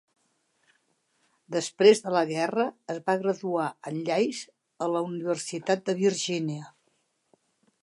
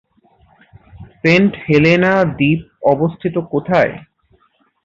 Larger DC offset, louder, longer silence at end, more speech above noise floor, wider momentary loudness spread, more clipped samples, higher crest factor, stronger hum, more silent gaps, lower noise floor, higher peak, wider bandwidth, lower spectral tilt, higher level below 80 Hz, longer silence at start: neither; second, -27 LUFS vs -15 LUFS; first, 1.15 s vs 0.85 s; about the same, 46 dB vs 44 dB; first, 13 LU vs 8 LU; neither; first, 22 dB vs 16 dB; neither; neither; first, -72 dBFS vs -58 dBFS; second, -6 dBFS vs 0 dBFS; first, 11.5 kHz vs 7.6 kHz; second, -4.5 dB/octave vs -7.5 dB/octave; second, -82 dBFS vs -48 dBFS; first, 1.5 s vs 0.95 s